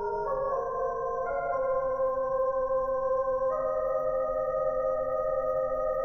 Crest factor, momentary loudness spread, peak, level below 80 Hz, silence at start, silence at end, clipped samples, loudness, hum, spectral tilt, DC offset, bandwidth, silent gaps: 10 dB; 3 LU; -18 dBFS; -50 dBFS; 0 s; 0 s; under 0.1%; -29 LUFS; none; -7.5 dB/octave; under 0.1%; 6.2 kHz; none